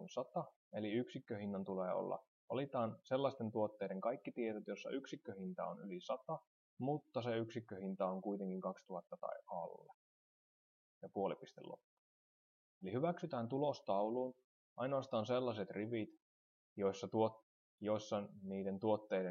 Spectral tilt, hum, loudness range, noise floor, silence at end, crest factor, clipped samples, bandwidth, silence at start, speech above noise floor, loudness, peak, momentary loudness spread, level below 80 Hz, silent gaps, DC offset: -7 dB/octave; none; 7 LU; under -90 dBFS; 0 s; 20 dB; under 0.1%; 7.4 kHz; 0 s; over 48 dB; -43 LUFS; -24 dBFS; 10 LU; under -90 dBFS; 0.56-0.71 s, 2.28-2.48 s, 6.47-6.77 s, 9.94-11.01 s, 11.84-12.81 s, 14.44-14.76 s, 16.22-16.76 s, 17.43-17.78 s; under 0.1%